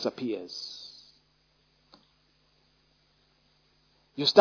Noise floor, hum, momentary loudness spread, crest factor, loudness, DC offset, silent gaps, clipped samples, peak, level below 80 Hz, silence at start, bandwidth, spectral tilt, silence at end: -68 dBFS; 50 Hz at -75 dBFS; 20 LU; 30 dB; -31 LUFS; under 0.1%; none; under 0.1%; -2 dBFS; -76 dBFS; 0 s; 5.4 kHz; -2.5 dB/octave; 0 s